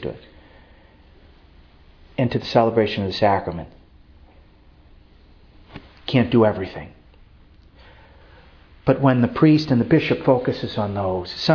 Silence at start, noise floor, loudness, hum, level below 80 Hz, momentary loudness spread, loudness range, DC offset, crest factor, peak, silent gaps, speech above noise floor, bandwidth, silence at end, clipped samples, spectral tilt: 0 s; -50 dBFS; -20 LUFS; none; -48 dBFS; 17 LU; 5 LU; under 0.1%; 20 dB; -2 dBFS; none; 31 dB; 5.4 kHz; 0 s; under 0.1%; -8 dB/octave